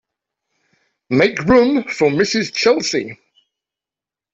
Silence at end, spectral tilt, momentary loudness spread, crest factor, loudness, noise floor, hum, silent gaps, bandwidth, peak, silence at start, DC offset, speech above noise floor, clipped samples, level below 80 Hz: 1.2 s; -4.5 dB/octave; 8 LU; 16 dB; -16 LUFS; -89 dBFS; none; none; 8 kHz; -2 dBFS; 1.1 s; under 0.1%; 73 dB; under 0.1%; -48 dBFS